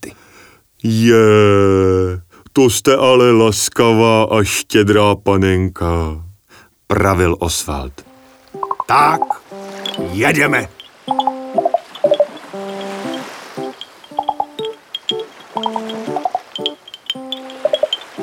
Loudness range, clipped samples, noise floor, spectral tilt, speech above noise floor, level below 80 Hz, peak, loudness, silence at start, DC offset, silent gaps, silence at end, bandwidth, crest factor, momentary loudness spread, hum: 11 LU; under 0.1%; -48 dBFS; -5 dB/octave; 35 dB; -38 dBFS; 0 dBFS; -15 LUFS; 0 s; under 0.1%; none; 0 s; over 20 kHz; 16 dB; 17 LU; none